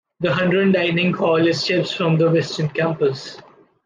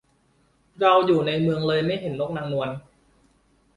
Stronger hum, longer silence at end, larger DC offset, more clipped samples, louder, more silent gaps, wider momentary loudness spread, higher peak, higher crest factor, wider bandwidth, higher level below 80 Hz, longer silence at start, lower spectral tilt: neither; second, 0.45 s vs 0.95 s; neither; neither; first, -18 LUFS vs -23 LUFS; neither; second, 6 LU vs 10 LU; about the same, -6 dBFS vs -6 dBFS; about the same, 14 dB vs 18 dB; second, 9 kHz vs 11 kHz; about the same, -60 dBFS vs -58 dBFS; second, 0.2 s vs 0.8 s; second, -6 dB/octave vs -7.5 dB/octave